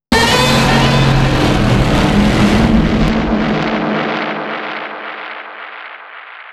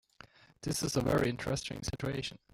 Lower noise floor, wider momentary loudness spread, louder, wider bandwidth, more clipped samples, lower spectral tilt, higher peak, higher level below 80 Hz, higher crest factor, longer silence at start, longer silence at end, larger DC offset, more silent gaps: second, -33 dBFS vs -59 dBFS; first, 18 LU vs 9 LU; first, -13 LUFS vs -34 LUFS; second, 13.5 kHz vs 17 kHz; neither; about the same, -5.5 dB/octave vs -4.5 dB/octave; first, 0 dBFS vs -18 dBFS; first, -24 dBFS vs -52 dBFS; about the same, 14 dB vs 16 dB; second, 0.1 s vs 0.6 s; second, 0 s vs 0.2 s; neither; neither